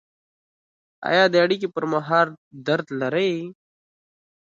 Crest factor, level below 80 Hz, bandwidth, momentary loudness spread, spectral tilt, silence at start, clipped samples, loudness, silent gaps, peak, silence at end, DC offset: 20 dB; -72 dBFS; 7.6 kHz; 14 LU; -6 dB/octave; 1 s; under 0.1%; -22 LUFS; 2.38-2.51 s; -4 dBFS; 0.9 s; under 0.1%